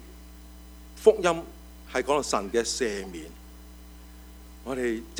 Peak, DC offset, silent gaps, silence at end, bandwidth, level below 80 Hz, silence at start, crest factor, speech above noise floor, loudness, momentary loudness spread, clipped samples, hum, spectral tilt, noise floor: -4 dBFS; under 0.1%; none; 0 s; over 20 kHz; -48 dBFS; 0 s; 24 dB; 20 dB; -27 LUFS; 25 LU; under 0.1%; none; -3.5 dB/octave; -46 dBFS